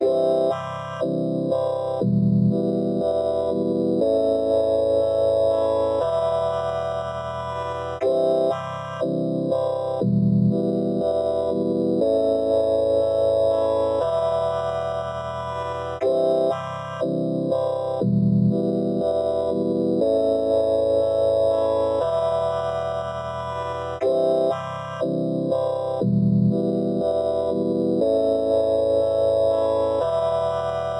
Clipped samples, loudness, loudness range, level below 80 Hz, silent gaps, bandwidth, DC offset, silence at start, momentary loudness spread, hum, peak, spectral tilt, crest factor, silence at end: under 0.1%; -22 LUFS; 3 LU; -54 dBFS; none; 10.5 kHz; under 0.1%; 0 s; 8 LU; none; -10 dBFS; -8.5 dB/octave; 12 dB; 0 s